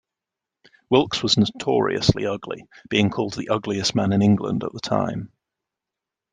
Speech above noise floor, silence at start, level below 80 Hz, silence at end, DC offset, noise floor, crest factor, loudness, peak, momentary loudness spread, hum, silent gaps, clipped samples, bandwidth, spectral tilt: 65 dB; 0.9 s; -50 dBFS; 1.05 s; under 0.1%; -87 dBFS; 20 dB; -22 LUFS; -2 dBFS; 10 LU; none; none; under 0.1%; 9.6 kHz; -5.5 dB/octave